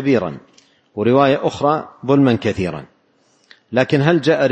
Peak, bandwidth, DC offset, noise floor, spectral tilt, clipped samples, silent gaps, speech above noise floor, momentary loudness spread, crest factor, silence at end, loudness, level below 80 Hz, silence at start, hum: 0 dBFS; 8.6 kHz; under 0.1%; -58 dBFS; -7 dB/octave; under 0.1%; none; 43 dB; 13 LU; 16 dB; 0 s; -17 LUFS; -52 dBFS; 0 s; none